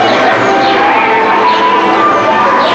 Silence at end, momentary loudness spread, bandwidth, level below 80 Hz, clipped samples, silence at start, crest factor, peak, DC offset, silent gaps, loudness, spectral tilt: 0 s; 0 LU; 8.6 kHz; -48 dBFS; under 0.1%; 0 s; 8 dB; 0 dBFS; under 0.1%; none; -8 LUFS; -4 dB/octave